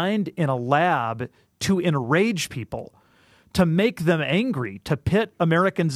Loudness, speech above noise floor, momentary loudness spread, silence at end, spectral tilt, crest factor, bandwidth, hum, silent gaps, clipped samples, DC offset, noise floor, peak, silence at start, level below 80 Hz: -23 LUFS; 35 dB; 9 LU; 0 s; -6 dB/octave; 18 dB; 14.5 kHz; none; none; under 0.1%; under 0.1%; -57 dBFS; -4 dBFS; 0 s; -50 dBFS